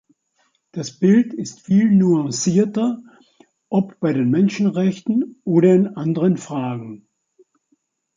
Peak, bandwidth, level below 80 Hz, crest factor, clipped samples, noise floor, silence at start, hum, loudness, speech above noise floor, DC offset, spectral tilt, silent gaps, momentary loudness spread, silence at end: -4 dBFS; 7.6 kHz; -64 dBFS; 16 dB; under 0.1%; -67 dBFS; 0.75 s; none; -18 LUFS; 49 dB; under 0.1%; -7 dB/octave; none; 15 LU; 1.2 s